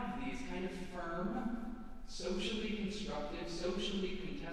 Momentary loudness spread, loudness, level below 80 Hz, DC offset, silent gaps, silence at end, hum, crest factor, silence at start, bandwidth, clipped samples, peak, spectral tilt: 6 LU; -41 LUFS; -50 dBFS; under 0.1%; none; 0 s; none; 14 dB; 0 s; 11 kHz; under 0.1%; -26 dBFS; -5 dB/octave